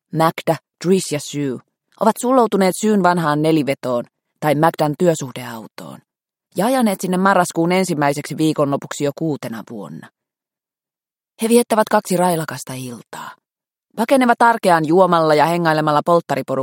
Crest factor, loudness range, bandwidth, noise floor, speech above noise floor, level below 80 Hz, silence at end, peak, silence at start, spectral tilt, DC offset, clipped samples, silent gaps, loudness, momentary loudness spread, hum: 18 dB; 5 LU; 17 kHz; under -90 dBFS; over 73 dB; -64 dBFS; 0 s; 0 dBFS; 0.15 s; -5.5 dB/octave; under 0.1%; under 0.1%; none; -17 LUFS; 18 LU; none